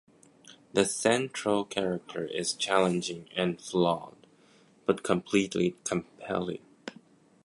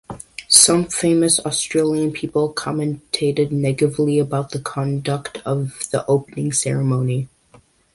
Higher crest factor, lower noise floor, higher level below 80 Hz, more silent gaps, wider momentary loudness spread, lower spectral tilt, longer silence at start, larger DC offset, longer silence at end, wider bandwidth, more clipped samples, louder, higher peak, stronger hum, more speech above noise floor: about the same, 22 dB vs 20 dB; first, -61 dBFS vs -52 dBFS; second, -66 dBFS vs -54 dBFS; neither; about the same, 9 LU vs 11 LU; about the same, -4 dB/octave vs -4 dB/octave; first, 0.5 s vs 0.1 s; neither; second, 0.55 s vs 0.7 s; second, 11.5 kHz vs 16 kHz; neither; second, -29 LUFS vs -18 LUFS; second, -8 dBFS vs 0 dBFS; neither; about the same, 32 dB vs 33 dB